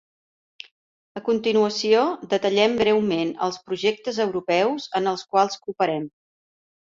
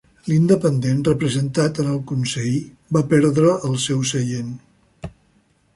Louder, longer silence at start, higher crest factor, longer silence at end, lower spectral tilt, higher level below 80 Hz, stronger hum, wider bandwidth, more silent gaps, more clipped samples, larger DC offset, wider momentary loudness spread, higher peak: second, -22 LUFS vs -19 LUFS; first, 1.15 s vs 0.25 s; about the same, 18 dB vs 16 dB; first, 0.85 s vs 0.65 s; second, -4.5 dB/octave vs -6 dB/octave; second, -64 dBFS vs -50 dBFS; neither; second, 7.6 kHz vs 11.5 kHz; neither; neither; neither; second, 7 LU vs 17 LU; about the same, -6 dBFS vs -4 dBFS